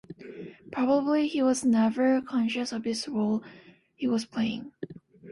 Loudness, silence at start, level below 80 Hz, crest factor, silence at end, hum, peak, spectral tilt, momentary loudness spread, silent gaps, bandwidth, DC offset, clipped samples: -27 LUFS; 0.1 s; -68 dBFS; 16 dB; 0 s; none; -12 dBFS; -5 dB/octave; 19 LU; none; 11.5 kHz; under 0.1%; under 0.1%